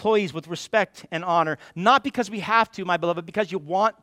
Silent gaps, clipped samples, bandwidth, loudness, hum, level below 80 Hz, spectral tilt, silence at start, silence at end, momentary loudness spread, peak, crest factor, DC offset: none; under 0.1%; 15 kHz; -23 LUFS; none; -66 dBFS; -5 dB/octave; 0 s; 0.1 s; 9 LU; -4 dBFS; 20 dB; under 0.1%